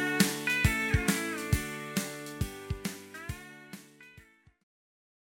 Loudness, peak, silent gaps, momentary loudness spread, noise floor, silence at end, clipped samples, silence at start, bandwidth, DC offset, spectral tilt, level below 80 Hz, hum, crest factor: -31 LUFS; -6 dBFS; none; 18 LU; -58 dBFS; 1.15 s; under 0.1%; 0 s; 17 kHz; under 0.1%; -4 dB/octave; -44 dBFS; none; 28 dB